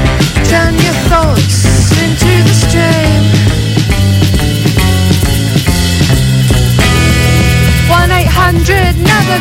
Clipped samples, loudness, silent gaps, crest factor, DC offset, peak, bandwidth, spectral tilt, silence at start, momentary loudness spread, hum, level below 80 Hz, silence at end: under 0.1%; -9 LUFS; none; 8 dB; under 0.1%; 0 dBFS; 16.5 kHz; -5 dB/octave; 0 s; 2 LU; none; -16 dBFS; 0 s